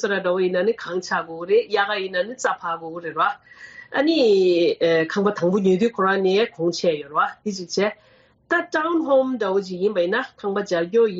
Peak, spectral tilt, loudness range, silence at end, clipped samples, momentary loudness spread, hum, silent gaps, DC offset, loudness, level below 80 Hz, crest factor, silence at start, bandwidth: -8 dBFS; -3.5 dB/octave; 4 LU; 0 s; under 0.1%; 8 LU; none; none; under 0.1%; -21 LUFS; -68 dBFS; 14 dB; 0 s; 8 kHz